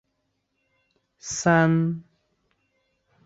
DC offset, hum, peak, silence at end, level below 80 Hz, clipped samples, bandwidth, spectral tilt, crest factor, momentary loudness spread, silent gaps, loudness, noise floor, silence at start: under 0.1%; none; -6 dBFS; 1.25 s; -62 dBFS; under 0.1%; 8 kHz; -5.5 dB/octave; 22 dB; 18 LU; none; -22 LUFS; -75 dBFS; 1.25 s